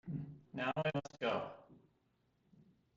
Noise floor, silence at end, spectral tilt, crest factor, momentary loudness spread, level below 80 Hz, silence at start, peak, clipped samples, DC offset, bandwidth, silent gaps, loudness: -78 dBFS; 0.35 s; -4.5 dB/octave; 20 dB; 12 LU; -76 dBFS; 0.05 s; -24 dBFS; under 0.1%; under 0.1%; 7.6 kHz; none; -41 LUFS